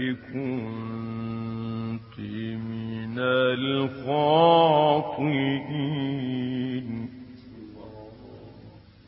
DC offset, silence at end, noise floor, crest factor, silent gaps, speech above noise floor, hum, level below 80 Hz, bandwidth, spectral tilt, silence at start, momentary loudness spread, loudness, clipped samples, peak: under 0.1%; 0.3 s; -48 dBFS; 20 dB; none; 24 dB; none; -60 dBFS; 5.8 kHz; -11 dB/octave; 0 s; 25 LU; -26 LUFS; under 0.1%; -6 dBFS